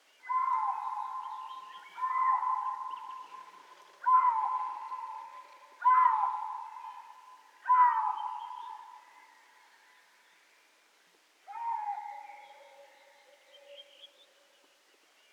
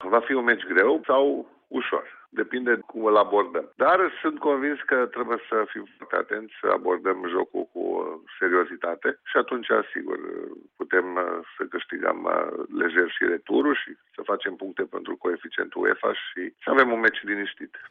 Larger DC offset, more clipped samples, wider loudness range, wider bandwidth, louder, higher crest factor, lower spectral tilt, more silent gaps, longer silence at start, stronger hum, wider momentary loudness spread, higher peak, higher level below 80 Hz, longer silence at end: neither; neither; first, 15 LU vs 4 LU; first, 9.2 kHz vs 4.4 kHz; second, -31 LUFS vs -25 LUFS; about the same, 20 dB vs 20 dB; second, 1 dB/octave vs -1 dB/octave; neither; first, 0.25 s vs 0 s; neither; first, 26 LU vs 12 LU; second, -14 dBFS vs -6 dBFS; second, under -90 dBFS vs -76 dBFS; first, 1.25 s vs 0 s